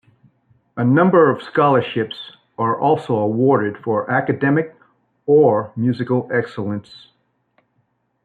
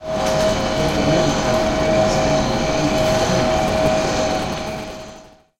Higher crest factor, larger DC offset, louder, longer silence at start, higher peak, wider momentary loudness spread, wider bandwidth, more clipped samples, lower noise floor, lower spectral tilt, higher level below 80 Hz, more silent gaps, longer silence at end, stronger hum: about the same, 16 dB vs 14 dB; second, under 0.1% vs 0.2%; about the same, -18 LUFS vs -18 LUFS; first, 0.75 s vs 0 s; about the same, -2 dBFS vs -4 dBFS; first, 13 LU vs 9 LU; second, 4.7 kHz vs 16.5 kHz; neither; first, -67 dBFS vs -42 dBFS; first, -9 dB/octave vs -4.5 dB/octave; second, -64 dBFS vs -32 dBFS; neither; first, 1.45 s vs 0.3 s; neither